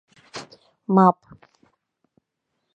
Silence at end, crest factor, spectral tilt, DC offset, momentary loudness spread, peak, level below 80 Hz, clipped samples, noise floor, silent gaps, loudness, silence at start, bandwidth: 1.65 s; 24 dB; -8 dB/octave; under 0.1%; 22 LU; -2 dBFS; -70 dBFS; under 0.1%; -78 dBFS; none; -19 LUFS; 0.35 s; 8.4 kHz